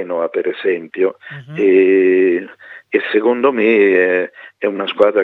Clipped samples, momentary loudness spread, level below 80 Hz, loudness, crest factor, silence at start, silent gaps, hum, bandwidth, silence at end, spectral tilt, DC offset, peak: under 0.1%; 11 LU; -68 dBFS; -15 LUFS; 14 dB; 0 s; none; none; 4.2 kHz; 0 s; -7.5 dB/octave; under 0.1%; 0 dBFS